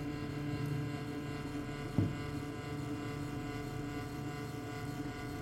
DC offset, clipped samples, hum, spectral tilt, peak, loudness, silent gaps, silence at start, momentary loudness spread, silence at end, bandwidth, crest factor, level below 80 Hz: under 0.1%; under 0.1%; none; -6.5 dB/octave; -18 dBFS; -40 LUFS; none; 0 s; 5 LU; 0 s; 16.5 kHz; 22 dB; -54 dBFS